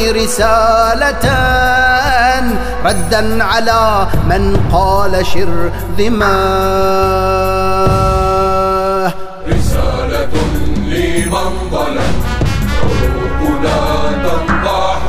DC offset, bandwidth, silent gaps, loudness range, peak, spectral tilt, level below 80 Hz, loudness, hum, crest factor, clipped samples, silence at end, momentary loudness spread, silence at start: under 0.1%; 16 kHz; none; 4 LU; 0 dBFS; -5 dB/octave; -20 dBFS; -13 LUFS; none; 10 dB; under 0.1%; 0 s; 6 LU; 0 s